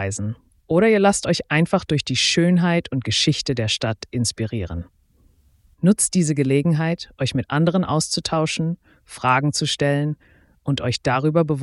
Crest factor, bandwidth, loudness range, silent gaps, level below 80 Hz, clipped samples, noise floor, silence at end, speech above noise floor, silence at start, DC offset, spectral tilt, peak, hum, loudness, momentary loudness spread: 16 dB; 12 kHz; 4 LU; none; -48 dBFS; under 0.1%; -57 dBFS; 0 s; 37 dB; 0 s; under 0.1%; -4.5 dB/octave; -4 dBFS; none; -20 LUFS; 10 LU